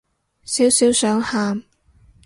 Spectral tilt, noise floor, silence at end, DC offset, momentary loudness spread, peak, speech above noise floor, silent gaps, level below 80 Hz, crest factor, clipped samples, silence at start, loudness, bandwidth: -3 dB/octave; -53 dBFS; 0.65 s; under 0.1%; 11 LU; -4 dBFS; 36 dB; none; -54 dBFS; 16 dB; under 0.1%; 0.45 s; -17 LUFS; 12 kHz